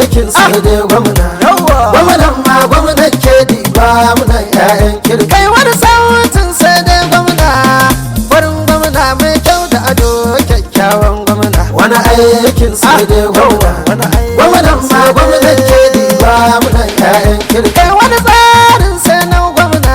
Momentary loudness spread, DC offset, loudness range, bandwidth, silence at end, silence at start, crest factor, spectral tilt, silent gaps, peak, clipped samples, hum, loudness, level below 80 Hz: 4 LU; under 0.1%; 2 LU; over 20 kHz; 0 s; 0 s; 6 dB; -4.5 dB/octave; none; 0 dBFS; 1%; none; -7 LUFS; -16 dBFS